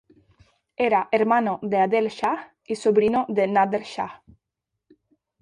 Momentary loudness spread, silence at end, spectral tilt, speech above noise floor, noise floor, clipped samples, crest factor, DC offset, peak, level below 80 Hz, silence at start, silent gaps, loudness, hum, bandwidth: 12 LU; 1.25 s; -6 dB/octave; 61 dB; -83 dBFS; under 0.1%; 18 dB; under 0.1%; -6 dBFS; -64 dBFS; 0.8 s; none; -23 LUFS; none; 10.5 kHz